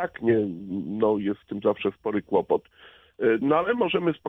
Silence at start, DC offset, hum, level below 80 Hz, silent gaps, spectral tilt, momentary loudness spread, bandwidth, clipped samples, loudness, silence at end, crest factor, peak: 0 s; under 0.1%; none; -62 dBFS; none; -9 dB/octave; 8 LU; 3.9 kHz; under 0.1%; -25 LUFS; 0 s; 16 dB; -8 dBFS